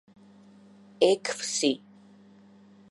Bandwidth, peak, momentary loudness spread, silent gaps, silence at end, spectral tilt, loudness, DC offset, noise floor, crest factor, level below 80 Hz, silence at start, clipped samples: 11.5 kHz; -8 dBFS; 6 LU; none; 1.15 s; -2.5 dB/octave; -27 LUFS; under 0.1%; -55 dBFS; 24 dB; -82 dBFS; 1 s; under 0.1%